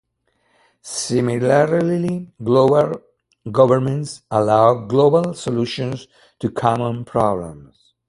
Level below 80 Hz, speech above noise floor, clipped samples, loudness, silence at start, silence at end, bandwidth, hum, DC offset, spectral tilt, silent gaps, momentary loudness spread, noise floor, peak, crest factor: -54 dBFS; 48 dB; under 0.1%; -18 LUFS; 0.85 s; 0.45 s; 11.5 kHz; none; under 0.1%; -6.5 dB/octave; none; 13 LU; -66 dBFS; 0 dBFS; 18 dB